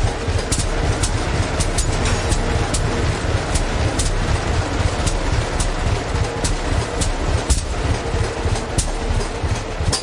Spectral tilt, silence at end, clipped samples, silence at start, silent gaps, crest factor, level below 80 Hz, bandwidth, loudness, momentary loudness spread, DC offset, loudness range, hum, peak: -4.5 dB/octave; 0 s; under 0.1%; 0 s; none; 16 dB; -24 dBFS; 11.5 kHz; -21 LUFS; 3 LU; under 0.1%; 1 LU; none; -4 dBFS